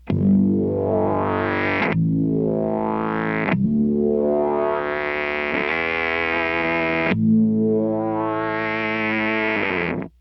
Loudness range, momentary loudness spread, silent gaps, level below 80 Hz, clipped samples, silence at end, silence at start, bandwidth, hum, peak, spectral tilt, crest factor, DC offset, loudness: 1 LU; 5 LU; none; -48 dBFS; under 0.1%; 0.1 s; 0.05 s; 6 kHz; none; -4 dBFS; -9 dB/octave; 16 dB; under 0.1%; -21 LUFS